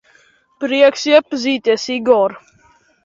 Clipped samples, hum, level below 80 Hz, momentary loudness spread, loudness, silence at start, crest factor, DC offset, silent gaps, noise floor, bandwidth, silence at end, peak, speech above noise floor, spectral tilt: under 0.1%; none; -62 dBFS; 7 LU; -15 LUFS; 0.6 s; 16 dB; under 0.1%; none; -53 dBFS; 7.6 kHz; 0.65 s; 0 dBFS; 39 dB; -3 dB/octave